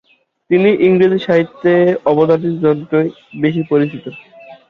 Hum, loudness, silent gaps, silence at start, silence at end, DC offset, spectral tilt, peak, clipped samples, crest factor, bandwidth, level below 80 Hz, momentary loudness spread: none; -14 LUFS; none; 0.5 s; 0.15 s; under 0.1%; -9 dB/octave; -2 dBFS; under 0.1%; 12 dB; 6 kHz; -56 dBFS; 8 LU